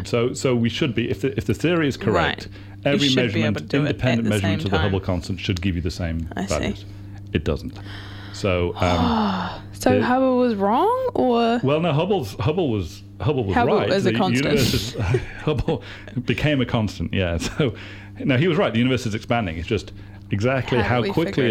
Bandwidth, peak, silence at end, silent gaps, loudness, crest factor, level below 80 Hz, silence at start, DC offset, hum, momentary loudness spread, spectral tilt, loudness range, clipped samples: 16 kHz; -2 dBFS; 0 s; none; -22 LUFS; 18 dB; -40 dBFS; 0 s; under 0.1%; none; 10 LU; -6 dB/octave; 5 LU; under 0.1%